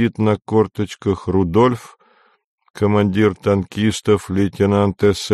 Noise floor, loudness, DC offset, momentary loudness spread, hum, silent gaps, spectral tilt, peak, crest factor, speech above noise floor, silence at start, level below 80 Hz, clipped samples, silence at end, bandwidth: -56 dBFS; -18 LUFS; under 0.1%; 6 LU; none; 2.44-2.58 s, 2.70-2.74 s; -6.5 dB/octave; -2 dBFS; 16 dB; 39 dB; 0 s; -46 dBFS; under 0.1%; 0 s; 13 kHz